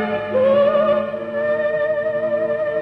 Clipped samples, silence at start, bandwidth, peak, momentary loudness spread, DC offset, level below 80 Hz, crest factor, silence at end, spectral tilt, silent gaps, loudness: under 0.1%; 0 s; 5 kHz; -6 dBFS; 6 LU; under 0.1%; -58 dBFS; 12 dB; 0 s; -7.5 dB/octave; none; -19 LUFS